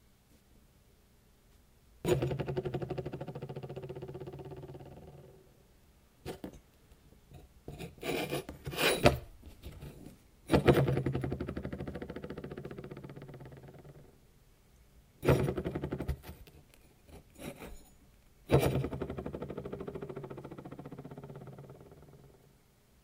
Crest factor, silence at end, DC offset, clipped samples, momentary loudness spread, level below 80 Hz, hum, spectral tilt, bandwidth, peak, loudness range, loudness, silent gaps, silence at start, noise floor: 30 dB; 0.75 s; under 0.1%; under 0.1%; 25 LU; -52 dBFS; none; -6 dB/octave; 16.5 kHz; -8 dBFS; 16 LU; -35 LUFS; none; 2.05 s; -65 dBFS